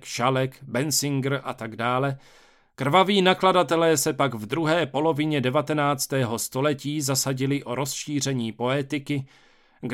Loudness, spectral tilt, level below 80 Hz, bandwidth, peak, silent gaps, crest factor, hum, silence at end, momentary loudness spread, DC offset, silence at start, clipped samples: -24 LUFS; -4.5 dB/octave; -64 dBFS; 17 kHz; -4 dBFS; none; 20 dB; none; 0 s; 9 LU; under 0.1%; 0 s; under 0.1%